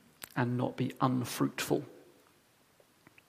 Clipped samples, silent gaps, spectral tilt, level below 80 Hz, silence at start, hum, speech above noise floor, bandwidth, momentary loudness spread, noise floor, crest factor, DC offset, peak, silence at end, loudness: under 0.1%; none; -5.5 dB/octave; -74 dBFS; 0.2 s; none; 34 dB; 15.5 kHz; 5 LU; -67 dBFS; 24 dB; under 0.1%; -12 dBFS; 1.25 s; -33 LUFS